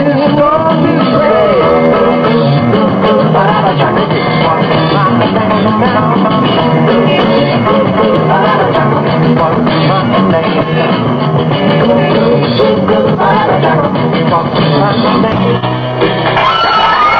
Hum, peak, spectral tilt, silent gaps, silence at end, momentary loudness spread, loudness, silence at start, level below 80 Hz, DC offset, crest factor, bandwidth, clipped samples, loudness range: none; 0 dBFS; -8.5 dB/octave; none; 0 s; 3 LU; -9 LUFS; 0 s; -38 dBFS; under 0.1%; 8 dB; 6.4 kHz; under 0.1%; 1 LU